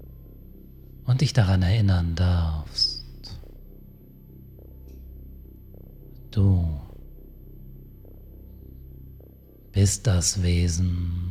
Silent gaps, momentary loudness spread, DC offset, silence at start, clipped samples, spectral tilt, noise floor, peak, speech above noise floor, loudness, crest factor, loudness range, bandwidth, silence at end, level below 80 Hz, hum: none; 26 LU; under 0.1%; 0 s; under 0.1%; -5 dB/octave; -48 dBFS; -6 dBFS; 27 dB; -24 LUFS; 20 dB; 13 LU; 14.5 kHz; 0 s; -38 dBFS; none